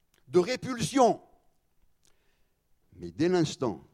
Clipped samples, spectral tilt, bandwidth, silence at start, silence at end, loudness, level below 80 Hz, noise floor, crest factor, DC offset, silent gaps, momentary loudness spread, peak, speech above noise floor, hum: under 0.1%; -5.5 dB/octave; 13.5 kHz; 0.3 s; 0.15 s; -28 LUFS; -64 dBFS; -69 dBFS; 20 dB; under 0.1%; none; 12 LU; -10 dBFS; 42 dB; none